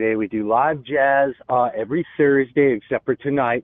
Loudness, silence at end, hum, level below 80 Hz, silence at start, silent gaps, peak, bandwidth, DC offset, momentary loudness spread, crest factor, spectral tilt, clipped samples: -20 LUFS; 0 s; none; -58 dBFS; 0 s; none; -6 dBFS; 3.8 kHz; under 0.1%; 6 LU; 14 dB; -10.5 dB/octave; under 0.1%